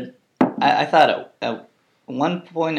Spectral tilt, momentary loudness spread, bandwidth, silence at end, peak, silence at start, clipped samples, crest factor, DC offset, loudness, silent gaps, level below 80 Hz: -6 dB/octave; 16 LU; 10.5 kHz; 0 s; 0 dBFS; 0 s; under 0.1%; 20 dB; under 0.1%; -20 LUFS; none; -76 dBFS